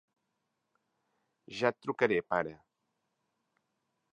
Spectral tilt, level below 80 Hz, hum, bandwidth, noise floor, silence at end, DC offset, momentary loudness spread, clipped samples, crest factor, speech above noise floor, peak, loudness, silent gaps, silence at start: -5.5 dB/octave; -74 dBFS; none; 9.6 kHz; -83 dBFS; 1.55 s; under 0.1%; 10 LU; under 0.1%; 26 dB; 51 dB; -10 dBFS; -32 LUFS; none; 1.5 s